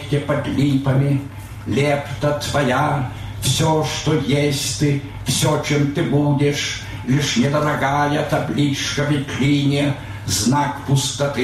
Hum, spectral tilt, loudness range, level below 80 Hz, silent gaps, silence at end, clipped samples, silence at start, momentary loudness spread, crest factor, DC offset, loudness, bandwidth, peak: none; -5 dB/octave; 1 LU; -42 dBFS; none; 0 s; under 0.1%; 0 s; 5 LU; 12 dB; under 0.1%; -19 LUFS; 14.5 kHz; -8 dBFS